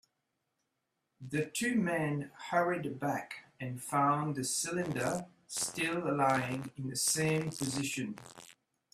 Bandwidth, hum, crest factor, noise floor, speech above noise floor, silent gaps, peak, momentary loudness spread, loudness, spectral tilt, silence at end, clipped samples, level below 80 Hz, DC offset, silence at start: 15.5 kHz; none; 20 dB; -84 dBFS; 50 dB; none; -16 dBFS; 11 LU; -34 LUFS; -4 dB/octave; 0.4 s; under 0.1%; -70 dBFS; under 0.1%; 1.2 s